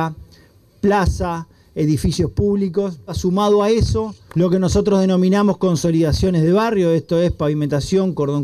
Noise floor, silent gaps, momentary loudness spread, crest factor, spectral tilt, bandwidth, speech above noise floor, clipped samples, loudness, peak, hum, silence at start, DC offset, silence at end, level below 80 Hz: -49 dBFS; none; 8 LU; 12 dB; -7 dB/octave; 13.5 kHz; 33 dB; under 0.1%; -18 LUFS; -6 dBFS; none; 0 s; under 0.1%; 0 s; -32 dBFS